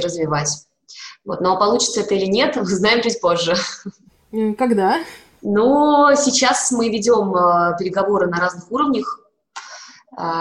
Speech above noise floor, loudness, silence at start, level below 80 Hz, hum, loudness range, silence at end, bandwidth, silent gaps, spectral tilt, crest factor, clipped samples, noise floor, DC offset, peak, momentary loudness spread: 23 dB; -17 LUFS; 0 s; -56 dBFS; none; 3 LU; 0 s; 13 kHz; none; -3.5 dB/octave; 14 dB; under 0.1%; -40 dBFS; under 0.1%; -4 dBFS; 21 LU